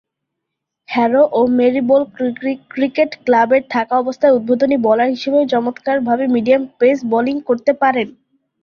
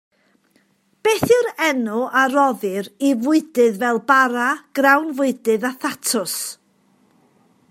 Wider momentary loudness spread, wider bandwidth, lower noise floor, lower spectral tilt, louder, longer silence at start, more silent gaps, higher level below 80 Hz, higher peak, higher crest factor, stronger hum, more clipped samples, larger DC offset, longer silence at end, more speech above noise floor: about the same, 7 LU vs 8 LU; second, 6.8 kHz vs 16 kHz; first, -78 dBFS vs -61 dBFS; first, -6.5 dB/octave vs -3.5 dB/octave; first, -15 LUFS vs -18 LUFS; second, 0.9 s vs 1.05 s; neither; first, -60 dBFS vs -66 dBFS; about the same, -2 dBFS vs 0 dBFS; second, 14 dB vs 20 dB; neither; neither; neither; second, 0.5 s vs 1.15 s; first, 64 dB vs 43 dB